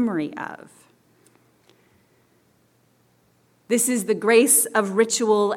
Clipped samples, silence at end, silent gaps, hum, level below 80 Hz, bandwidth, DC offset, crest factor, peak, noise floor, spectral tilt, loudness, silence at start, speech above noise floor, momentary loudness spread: under 0.1%; 0 s; none; none; -78 dBFS; 18 kHz; under 0.1%; 20 dB; -4 dBFS; -62 dBFS; -3 dB/octave; -19 LUFS; 0 s; 41 dB; 18 LU